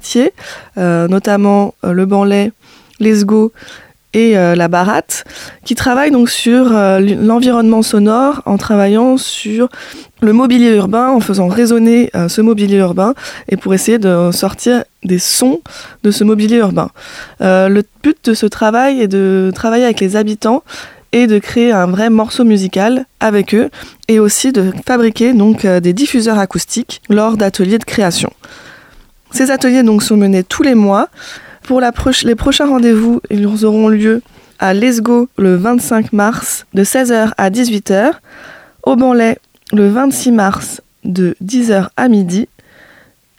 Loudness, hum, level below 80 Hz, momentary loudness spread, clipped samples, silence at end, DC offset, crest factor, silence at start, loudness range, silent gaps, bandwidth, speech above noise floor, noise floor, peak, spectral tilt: -11 LUFS; none; -40 dBFS; 8 LU; under 0.1%; 0.95 s; under 0.1%; 10 dB; 0.05 s; 2 LU; none; 16.5 kHz; 35 dB; -46 dBFS; 0 dBFS; -5 dB/octave